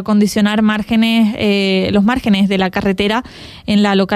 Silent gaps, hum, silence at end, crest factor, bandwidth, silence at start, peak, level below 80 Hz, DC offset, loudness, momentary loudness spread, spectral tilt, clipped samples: none; none; 0 s; 12 dB; 14 kHz; 0 s; -2 dBFS; -40 dBFS; under 0.1%; -14 LUFS; 4 LU; -6 dB/octave; under 0.1%